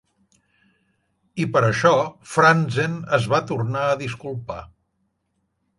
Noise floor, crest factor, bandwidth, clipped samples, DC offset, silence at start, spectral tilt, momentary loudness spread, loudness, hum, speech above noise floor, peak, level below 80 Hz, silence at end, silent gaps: -72 dBFS; 20 dB; 11.5 kHz; under 0.1%; under 0.1%; 1.35 s; -6 dB/octave; 16 LU; -20 LUFS; none; 52 dB; -2 dBFS; -56 dBFS; 1.1 s; none